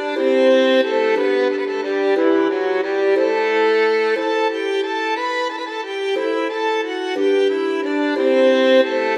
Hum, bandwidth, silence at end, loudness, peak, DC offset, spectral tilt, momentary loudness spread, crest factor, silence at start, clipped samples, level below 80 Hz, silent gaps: none; 9.4 kHz; 0 s; -18 LUFS; -4 dBFS; under 0.1%; -3 dB/octave; 7 LU; 14 dB; 0 s; under 0.1%; -74 dBFS; none